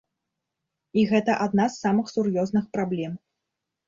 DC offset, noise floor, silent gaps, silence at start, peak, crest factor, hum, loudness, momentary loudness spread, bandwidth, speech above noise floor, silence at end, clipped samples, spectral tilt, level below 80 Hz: under 0.1%; -84 dBFS; none; 0.95 s; -8 dBFS; 18 dB; none; -24 LUFS; 8 LU; 7.6 kHz; 60 dB; 0.7 s; under 0.1%; -6.5 dB/octave; -64 dBFS